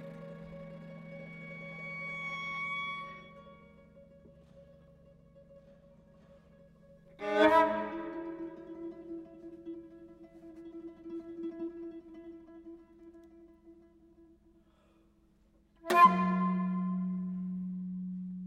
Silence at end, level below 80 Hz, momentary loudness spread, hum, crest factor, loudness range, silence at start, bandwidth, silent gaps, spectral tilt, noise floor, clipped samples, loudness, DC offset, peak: 0 s; -68 dBFS; 27 LU; none; 24 dB; 17 LU; 0 s; 14 kHz; none; -7 dB/octave; -67 dBFS; under 0.1%; -32 LUFS; under 0.1%; -12 dBFS